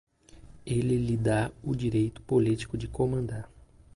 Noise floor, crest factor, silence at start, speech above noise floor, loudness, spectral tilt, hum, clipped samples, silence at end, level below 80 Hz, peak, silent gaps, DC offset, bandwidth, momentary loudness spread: -52 dBFS; 16 dB; 0.35 s; 24 dB; -29 LUFS; -7.5 dB/octave; none; under 0.1%; 0.5 s; -48 dBFS; -14 dBFS; none; under 0.1%; 11.5 kHz; 10 LU